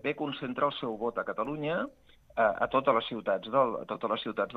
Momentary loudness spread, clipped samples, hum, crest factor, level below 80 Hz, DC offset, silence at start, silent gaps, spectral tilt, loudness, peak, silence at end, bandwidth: 8 LU; under 0.1%; none; 20 dB; -64 dBFS; under 0.1%; 0.05 s; none; -7 dB/octave; -31 LUFS; -10 dBFS; 0 s; 5.8 kHz